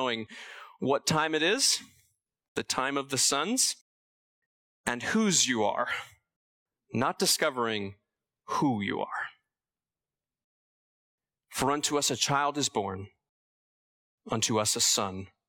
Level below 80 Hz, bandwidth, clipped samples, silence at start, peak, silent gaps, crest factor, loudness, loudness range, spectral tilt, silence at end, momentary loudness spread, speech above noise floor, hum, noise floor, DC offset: -68 dBFS; 18 kHz; under 0.1%; 0 s; -12 dBFS; 2.48-2.55 s, 3.81-4.84 s, 6.36-6.66 s, 10.44-11.18 s, 13.29-14.18 s; 20 dB; -28 LUFS; 7 LU; -2.5 dB/octave; 0.25 s; 13 LU; over 61 dB; none; under -90 dBFS; under 0.1%